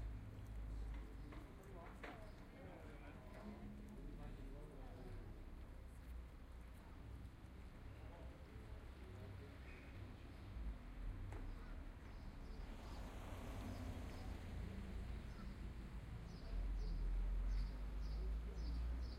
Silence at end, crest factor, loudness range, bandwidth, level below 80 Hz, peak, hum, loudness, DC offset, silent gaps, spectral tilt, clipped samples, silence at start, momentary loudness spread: 0 s; 14 dB; 9 LU; 13.5 kHz; -50 dBFS; -36 dBFS; none; -53 LUFS; under 0.1%; none; -7 dB/octave; under 0.1%; 0 s; 10 LU